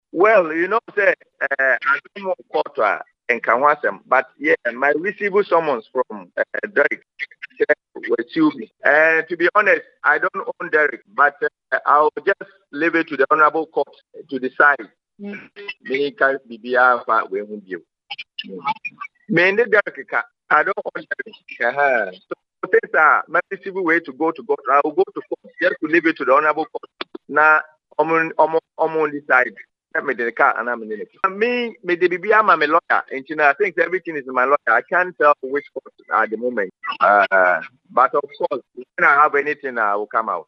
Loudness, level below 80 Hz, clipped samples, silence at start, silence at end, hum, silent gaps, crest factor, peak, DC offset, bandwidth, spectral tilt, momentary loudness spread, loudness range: -18 LUFS; -78 dBFS; under 0.1%; 0.15 s; 0.05 s; none; none; 20 dB; 0 dBFS; under 0.1%; 6.4 kHz; -6 dB/octave; 14 LU; 4 LU